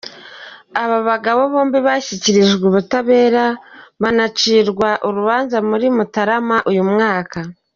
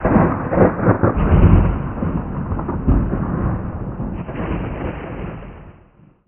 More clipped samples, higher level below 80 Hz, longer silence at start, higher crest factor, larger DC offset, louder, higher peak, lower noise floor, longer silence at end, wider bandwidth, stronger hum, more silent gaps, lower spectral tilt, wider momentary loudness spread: neither; second, -56 dBFS vs -24 dBFS; about the same, 0.05 s vs 0 s; about the same, 14 dB vs 18 dB; second, under 0.1% vs 0.2%; first, -15 LUFS vs -19 LUFS; about the same, -2 dBFS vs 0 dBFS; second, -37 dBFS vs -49 dBFS; second, 0.25 s vs 0.55 s; first, 7.4 kHz vs 3.3 kHz; neither; neither; second, -3.5 dB/octave vs -13 dB/octave; second, 11 LU vs 14 LU